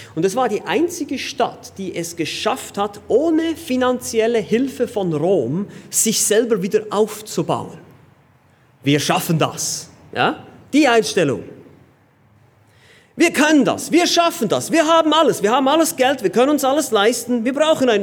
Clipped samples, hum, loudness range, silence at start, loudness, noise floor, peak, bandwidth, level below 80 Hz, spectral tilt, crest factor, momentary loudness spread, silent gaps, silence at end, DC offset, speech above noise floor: under 0.1%; none; 6 LU; 0 s; -18 LUFS; -54 dBFS; -2 dBFS; over 20 kHz; -64 dBFS; -3.5 dB/octave; 16 dB; 10 LU; none; 0 s; under 0.1%; 36 dB